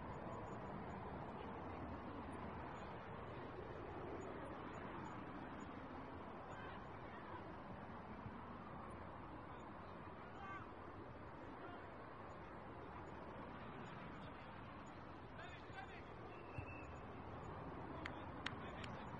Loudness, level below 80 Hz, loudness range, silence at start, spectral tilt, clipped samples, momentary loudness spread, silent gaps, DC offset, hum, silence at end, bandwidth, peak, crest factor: -53 LUFS; -66 dBFS; 3 LU; 0 s; -7 dB/octave; under 0.1%; 4 LU; none; under 0.1%; none; 0 s; 9.4 kHz; -28 dBFS; 26 dB